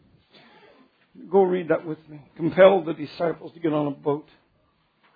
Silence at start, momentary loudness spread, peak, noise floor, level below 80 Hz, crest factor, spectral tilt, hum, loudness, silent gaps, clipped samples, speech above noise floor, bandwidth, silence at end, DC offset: 1.2 s; 15 LU; -2 dBFS; -66 dBFS; -68 dBFS; 22 dB; -9.5 dB/octave; none; -23 LUFS; none; under 0.1%; 44 dB; 5 kHz; 0.95 s; under 0.1%